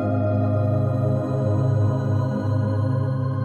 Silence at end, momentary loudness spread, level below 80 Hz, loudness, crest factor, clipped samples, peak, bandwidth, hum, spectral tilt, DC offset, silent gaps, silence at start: 0 s; 2 LU; -50 dBFS; -22 LUFS; 10 dB; under 0.1%; -10 dBFS; 6.6 kHz; none; -10.5 dB/octave; under 0.1%; none; 0 s